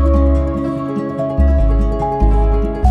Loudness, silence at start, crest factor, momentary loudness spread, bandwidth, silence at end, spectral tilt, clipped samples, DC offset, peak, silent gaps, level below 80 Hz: -16 LUFS; 0 s; 12 dB; 6 LU; 4.7 kHz; 0 s; -10 dB/octave; under 0.1%; under 0.1%; 0 dBFS; none; -14 dBFS